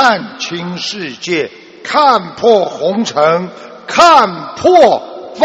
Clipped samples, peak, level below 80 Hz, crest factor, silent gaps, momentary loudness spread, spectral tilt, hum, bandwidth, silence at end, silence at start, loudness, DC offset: 0.5%; 0 dBFS; -54 dBFS; 12 dB; none; 14 LU; -4 dB/octave; none; 11.5 kHz; 0 s; 0 s; -12 LUFS; under 0.1%